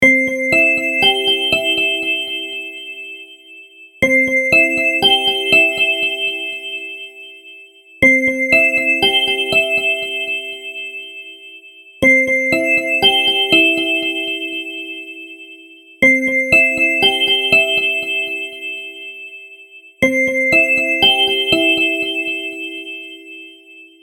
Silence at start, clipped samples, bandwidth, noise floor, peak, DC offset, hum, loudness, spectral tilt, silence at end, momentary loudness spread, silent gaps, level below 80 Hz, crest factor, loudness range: 0 s; under 0.1%; 19.5 kHz; -42 dBFS; 0 dBFS; under 0.1%; none; -13 LUFS; -2.5 dB/octave; 0.15 s; 19 LU; none; -52 dBFS; 16 dB; 4 LU